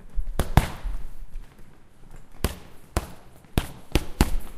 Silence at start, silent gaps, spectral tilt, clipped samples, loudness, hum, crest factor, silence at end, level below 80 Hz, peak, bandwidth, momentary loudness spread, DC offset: 0 s; none; -5.5 dB/octave; under 0.1%; -29 LUFS; none; 26 dB; 0 s; -30 dBFS; 0 dBFS; 16 kHz; 21 LU; under 0.1%